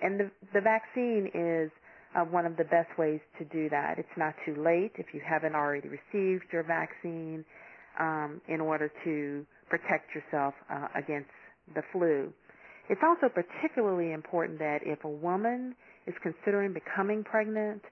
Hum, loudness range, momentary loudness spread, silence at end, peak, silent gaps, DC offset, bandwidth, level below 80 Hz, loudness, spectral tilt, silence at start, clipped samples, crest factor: none; 4 LU; 11 LU; 0 s; -12 dBFS; none; under 0.1%; 6.2 kHz; -80 dBFS; -32 LUFS; -9 dB/octave; 0 s; under 0.1%; 20 dB